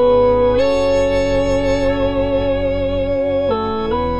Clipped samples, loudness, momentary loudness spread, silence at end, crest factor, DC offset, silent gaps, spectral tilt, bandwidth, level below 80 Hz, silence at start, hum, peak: under 0.1%; -16 LUFS; 5 LU; 0 s; 10 dB; 3%; none; -6.5 dB/octave; 10.5 kHz; -30 dBFS; 0 s; none; -4 dBFS